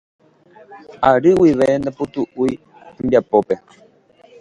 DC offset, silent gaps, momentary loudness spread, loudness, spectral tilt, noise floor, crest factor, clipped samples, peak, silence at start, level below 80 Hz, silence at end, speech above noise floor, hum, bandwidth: under 0.1%; none; 12 LU; -17 LUFS; -7.5 dB/octave; -50 dBFS; 18 dB; under 0.1%; 0 dBFS; 0.7 s; -50 dBFS; 0.85 s; 34 dB; none; 11 kHz